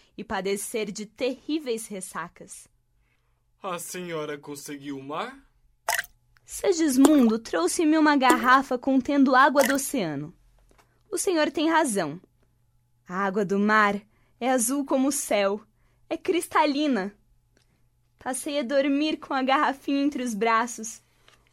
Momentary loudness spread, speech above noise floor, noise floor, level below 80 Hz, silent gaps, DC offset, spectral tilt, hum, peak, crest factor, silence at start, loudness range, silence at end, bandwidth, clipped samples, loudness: 17 LU; 44 dB; -68 dBFS; -62 dBFS; none; under 0.1%; -3.5 dB/octave; none; -2 dBFS; 24 dB; 0.2 s; 13 LU; 0.55 s; 16 kHz; under 0.1%; -24 LUFS